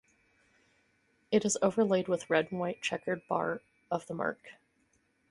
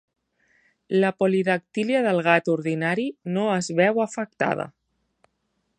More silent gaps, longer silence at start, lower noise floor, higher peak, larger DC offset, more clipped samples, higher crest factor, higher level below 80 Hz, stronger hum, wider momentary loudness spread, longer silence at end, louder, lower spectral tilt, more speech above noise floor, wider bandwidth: neither; first, 1.3 s vs 0.9 s; about the same, -73 dBFS vs -74 dBFS; second, -12 dBFS vs -2 dBFS; neither; neither; about the same, 22 dB vs 22 dB; about the same, -72 dBFS vs -72 dBFS; neither; about the same, 9 LU vs 7 LU; second, 0.8 s vs 1.1 s; second, -32 LUFS vs -23 LUFS; second, -4.5 dB/octave vs -6 dB/octave; second, 42 dB vs 51 dB; first, 11.5 kHz vs 9.6 kHz